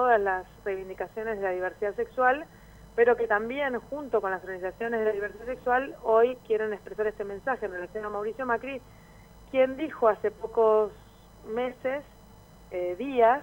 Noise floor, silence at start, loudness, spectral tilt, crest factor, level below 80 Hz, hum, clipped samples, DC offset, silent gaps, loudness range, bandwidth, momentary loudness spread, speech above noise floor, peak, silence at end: -52 dBFS; 0 s; -28 LUFS; -6 dB/octave; 18 dB; -56 dBFS; none; under 0.1%; under 0.1%; none; 2 LU; 16.5 kHz; 11 LU; 24 dB; -10 dBFS; 0 s